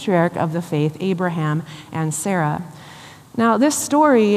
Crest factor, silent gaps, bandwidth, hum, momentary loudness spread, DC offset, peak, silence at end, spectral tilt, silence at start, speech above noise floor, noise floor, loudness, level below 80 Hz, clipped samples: 16 dB; none; 15 kHz; none; 15 LU; under 0.1%; -4 dBFS; 0 s; -5.5 dB/octave; 0 s; 23 dB; -41 dBFS; -19 LUFS; -64 dBFS; under 0.1%